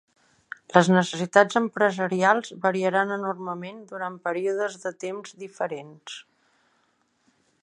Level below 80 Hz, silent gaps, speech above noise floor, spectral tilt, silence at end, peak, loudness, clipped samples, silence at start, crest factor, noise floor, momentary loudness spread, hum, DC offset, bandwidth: -74 dBFS; none; 44 dB; -5.5 dB/octave; 1.4 s; 0 dBFS; -24 LUFS; under 0.1%; 0.7 s; 26 dB; -69 dBFS; 20 LU; none; under 0.1%; 10.5 kHz